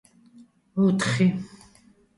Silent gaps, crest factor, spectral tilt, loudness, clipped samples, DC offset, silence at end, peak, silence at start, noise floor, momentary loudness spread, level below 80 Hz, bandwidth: none; 18 dB; -6 dB/octave; -24 LUFS; under 0.1%; under 0.1%; 0.7 s; -10 dBFS; 0.75 s; -57 dBFS; 14 LU; -62 dBFS; 11.5 kHz